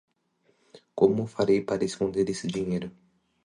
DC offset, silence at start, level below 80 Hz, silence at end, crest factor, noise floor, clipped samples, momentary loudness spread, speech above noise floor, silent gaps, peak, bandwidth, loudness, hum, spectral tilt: under 0.1%; 0.75 s; -60 dBFS; 0.55 s; 20 dB; -69 dBFS; under 0.1%; 9 LU; 43 dB; none; -8 dBFS; 11 kHz; -27 LUFS; none; -6.5 dB/octave